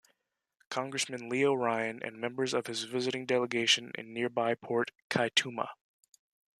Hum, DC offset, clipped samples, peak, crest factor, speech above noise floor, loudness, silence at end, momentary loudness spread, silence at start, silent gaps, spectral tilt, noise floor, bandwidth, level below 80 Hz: none; under 0.1%; under 0.1%; -10 dBFS; 24 dB; 50 dB; -32 LUFS; 0.85 s; 10 LU; 0.7 s; 5.02-5.10 s; -3 dB/octave; -82 dBFS; 13.5 kHz; -80 dBFS